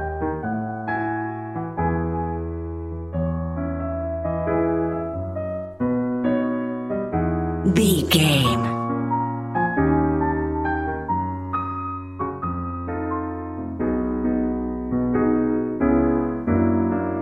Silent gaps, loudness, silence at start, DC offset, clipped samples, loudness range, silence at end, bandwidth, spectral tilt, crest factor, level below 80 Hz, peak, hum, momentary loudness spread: none; -23 LUFS; 0 s; 0.1%; under 0.1%; 6 LU; 0 s; 16 kHz; -6 dB/octave; 18 dB; -38 dBFS; -4 dBFS; none; 10 LU